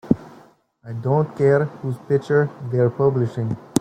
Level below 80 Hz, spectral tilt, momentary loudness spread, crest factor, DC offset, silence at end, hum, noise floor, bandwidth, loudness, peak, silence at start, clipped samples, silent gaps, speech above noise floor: -56 dBFS; -7.5 dB/octave; 9 LU; 18 dB; under 0.1%; 0 s; none; -51 dBFS; 15.5 kHz; -21 LUFS; -2 dBFS; 0.05 s; under 0.1%; none; 31 dB